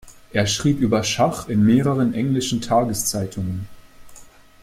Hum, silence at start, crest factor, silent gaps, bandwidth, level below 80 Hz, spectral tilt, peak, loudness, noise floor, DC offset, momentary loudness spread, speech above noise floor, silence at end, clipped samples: none; 0.05 s; 16 dB; none; 16 kHz; -48 dBFS; -5 dB/octave; -4 dBFS; -20 LUFS; -44 dBFS; under 0.1%; 10 LU; 24 dB; 0.35 s; under 0.1%